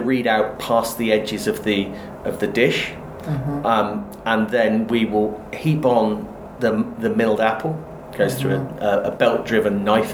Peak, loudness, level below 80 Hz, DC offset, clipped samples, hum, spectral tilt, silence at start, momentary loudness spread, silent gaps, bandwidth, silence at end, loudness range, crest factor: -2 dBFS; -20 LUFS; -48 dBFS; under 0.1%; under 0.1%; none; -6 dB/octave; 0 s; 9 LU; none; over 20 kHz; 0 s; 2 LU; 18 dB